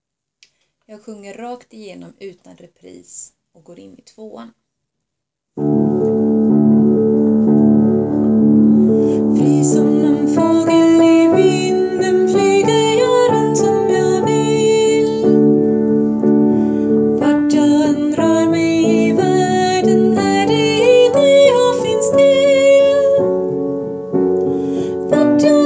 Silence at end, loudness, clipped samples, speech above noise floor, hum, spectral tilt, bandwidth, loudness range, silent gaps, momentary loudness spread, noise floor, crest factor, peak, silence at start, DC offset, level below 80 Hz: 0 s; -13 LUFS; under 0.1%; 44 dB; none; -6 dB/octave; 8 kHz; 3 LU; none; 8 LU; -79 dBFS; 12 dB; 0 dBFS; 0.9 s; under 0.1%; -52 dBFS